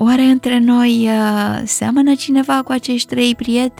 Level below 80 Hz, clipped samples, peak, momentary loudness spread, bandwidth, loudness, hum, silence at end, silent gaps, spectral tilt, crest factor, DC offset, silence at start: -50 dBFS; under 0.1%; -2 dBFS; 6 LU; 15.5 kHz; -14 LUFS; none; 0.1 s; none; -4 dB/octave; 12 dB; under 0.1%; 0 s